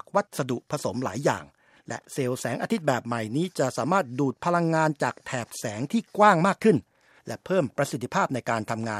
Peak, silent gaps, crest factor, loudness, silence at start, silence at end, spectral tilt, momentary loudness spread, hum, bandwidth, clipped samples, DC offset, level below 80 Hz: -4 dBFS; none; 22 dB; -26 LUFS; 0.15 s; 0 s; -5.5 dB/octave; 12 LU; none; 15 kHz; under 0.1%; under 0.1%; -68 dBFS